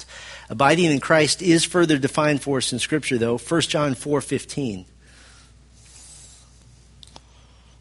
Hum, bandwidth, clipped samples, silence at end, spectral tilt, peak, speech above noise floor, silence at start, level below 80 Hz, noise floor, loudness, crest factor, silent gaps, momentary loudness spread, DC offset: none; 11.5 kHz; under 0.1%; 1.55 s; -4.5 dB/octave; -2 dBFS; 30 dB; 0 s; -52 dBFS; -50 dBFS; -20 LUFS; 22 dB; none; 18 LU; under 0.1%